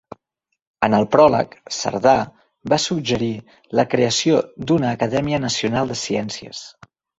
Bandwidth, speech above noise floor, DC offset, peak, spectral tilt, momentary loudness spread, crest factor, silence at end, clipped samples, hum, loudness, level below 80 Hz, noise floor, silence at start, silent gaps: 8 kHz; 58 dB; under 0.1%; 0 dBFS; -4.5 dB/octave; 14 LU; 18 dB; 0.5 s; under 0.1%; none; -19 LUFS; -52 dBFS; -77 dBFS; 0.8 s; none